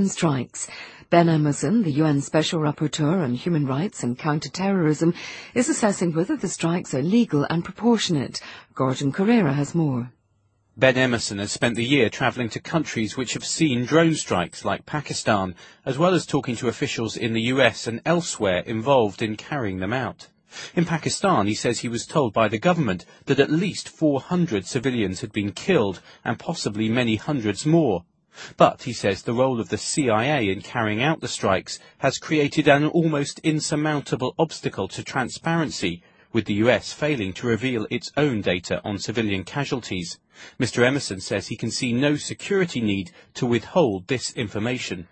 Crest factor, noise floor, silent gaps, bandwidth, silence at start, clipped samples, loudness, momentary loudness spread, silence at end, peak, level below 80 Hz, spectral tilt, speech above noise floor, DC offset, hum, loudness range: 22 dB; -66 dBFS; none; 8.8 kHz; 0 s; under 0.1%; -23 LUFS; 8 LU; 0.05 s; 0 dBFS; -56 dBFS; -5 dB/octave; 43 dB; under 0.1%; none; 3 LU